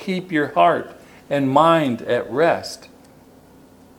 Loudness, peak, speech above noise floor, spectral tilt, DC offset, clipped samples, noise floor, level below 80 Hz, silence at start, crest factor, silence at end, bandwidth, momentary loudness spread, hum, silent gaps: -19 LUFS; 0 dBFS; 29 dB; -6 dB/octave; under 0.1%; under 0.1%; -48 dBFS; -62 dBFS; 0 s; 20 dB; 1.1 s; 17 kHz; 14 LU; none; none